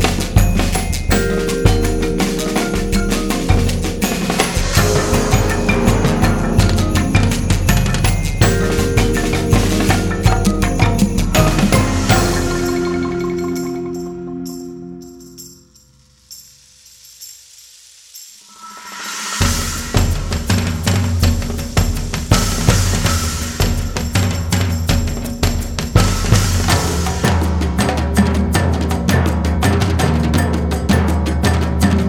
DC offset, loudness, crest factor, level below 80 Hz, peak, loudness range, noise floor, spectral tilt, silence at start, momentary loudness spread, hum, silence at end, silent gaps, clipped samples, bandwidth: under 0.1%; -16 LUFS; 16 dB; -22 dBFS; 0 dBFS; 10 LU; -50 dBFS; -5 dB/octave; 0 s; 12 LU; none; 0 s; none; under 0.1%; 20 kHz